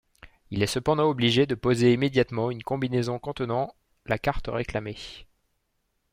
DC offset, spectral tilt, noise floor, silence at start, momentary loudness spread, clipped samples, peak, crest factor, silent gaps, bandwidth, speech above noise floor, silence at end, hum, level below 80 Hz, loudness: under 0.1%; -6 dB/octave; -75 dBFS; 0.25 s; 12 LU; under 0.1%; -8 dBFS; 20 dB; none; 16 kHz; 49 dB; 0.9 s; none; -48 dBFS; -26 LUFS